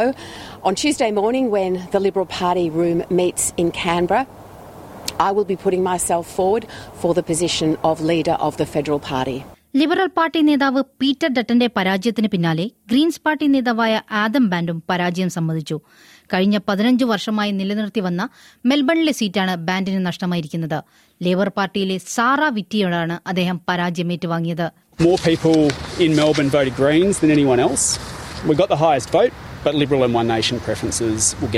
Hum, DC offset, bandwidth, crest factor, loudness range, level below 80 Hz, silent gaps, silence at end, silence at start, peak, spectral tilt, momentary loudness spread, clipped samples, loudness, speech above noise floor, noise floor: none; under 0.1%; 16 kHz; 16 dB; 4 LU; -48 dBFS; none; 0 s; 0 s; -2 dBFS; -4.5 dB/octave; 8 LU; under 0.1%; -19 LUFS; 20 dB; -38 dBFS